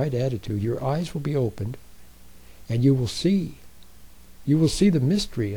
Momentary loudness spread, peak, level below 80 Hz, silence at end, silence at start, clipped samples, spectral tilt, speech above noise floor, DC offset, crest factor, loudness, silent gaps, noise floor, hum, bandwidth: 14 LU; -8 dBFS; -44 dBFS; 0 s; 0 s; under 0.1%; -7 dB/octave; 27 dB; 0.6%; 16 dB; -24 LUFS; none; -50 dBFS; none; 19.5 kHz